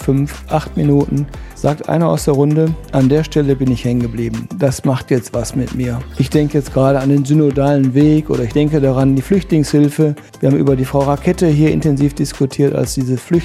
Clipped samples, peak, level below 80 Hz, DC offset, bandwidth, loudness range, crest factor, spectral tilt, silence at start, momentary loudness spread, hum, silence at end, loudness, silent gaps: under 0.1%; 0 dBFS; -32 dBFS; under 0.1%; 14 kHz; 3 LU; 14 dB; -7.5 dB/octave; 0 s; 7 LU; none; 0 s; -15 LUFS; none